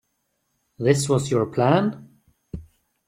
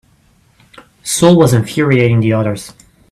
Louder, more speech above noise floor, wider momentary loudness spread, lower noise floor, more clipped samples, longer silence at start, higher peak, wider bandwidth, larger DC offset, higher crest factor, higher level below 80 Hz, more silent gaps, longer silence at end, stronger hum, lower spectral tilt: second, -21 LUFS vs -12 LUFS; first, 53 dB vs 41 dB; first, 20 LU vs 17 LU; first, -73 dBFS vs -52 dBFS; neither; second, 0.8 s vs 1.05 s; second, -4 dBFS vs 0 dBFS; about the same, 14.5 kHz vs 15 kHz; neither; first, 20 dB vs 14 dB; second, -52 dBFS vs -46 dBFS; neither; about the same, 0.45 s vs 0.45 s; neither; about the same, -6 dB/octave vs -6 dB/octave